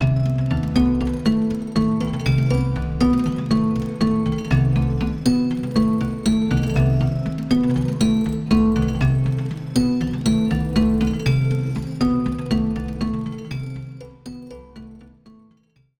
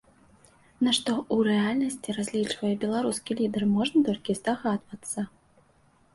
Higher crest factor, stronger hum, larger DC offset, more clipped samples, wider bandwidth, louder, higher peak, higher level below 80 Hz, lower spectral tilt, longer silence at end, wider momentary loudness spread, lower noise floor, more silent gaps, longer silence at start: about the same, 14 dB vs 16 dB; neither; neither; neither; about the same, 12.5 kHz vs 11.5 kHz; first, -20 LUFS vs -27 LUFS; first, -6 dBFS vs -10 dBFS; first, -32 dBFS vs -64 dBFS; first, -7.5 dB/octave vs -4.5 dB/octave; about the same, 0.95 s vs 0.85 s; about the same, 10 LU vs 9 LU; about the same, -59 dBFS vs -62 dBFS; neither; second, 0 s vs 0.8 s